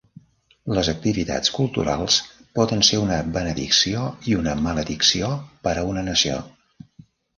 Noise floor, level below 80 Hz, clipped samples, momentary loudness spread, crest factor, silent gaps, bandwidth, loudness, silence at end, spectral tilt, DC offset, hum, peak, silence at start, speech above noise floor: -51 dBFS; -42 dBFS; under 0.1%; 9 LU; 20 dB; none; 11 kHz; -21 LUFS; 0.9 s; -3.5 dB/octave; under 0.1%; none; -2 dBFS; 0.65 s; 30 dB